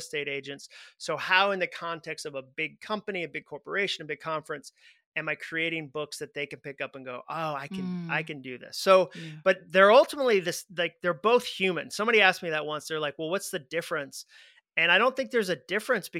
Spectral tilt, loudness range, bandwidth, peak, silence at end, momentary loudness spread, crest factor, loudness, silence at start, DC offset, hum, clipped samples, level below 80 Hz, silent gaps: -3.5 dB/octave; 10 LU; 16 kHz; -6 dBFS; 0 s; 16 LU; 24 dB; -27 LUFS; 0 s; under 0.1%; none; under 0.1%; -78 dBFS; 5.06-5.12 s